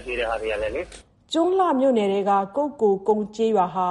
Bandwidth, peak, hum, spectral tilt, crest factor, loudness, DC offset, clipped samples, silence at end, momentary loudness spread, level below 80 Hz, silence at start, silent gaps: 11.5 kHz; -8 dBFS; none; -6 dB/octave; 14 dB; -22 LUFS; under 0.1%; under 0.1%; 0 s; 8 LU; -50 dBFS; 0 s; none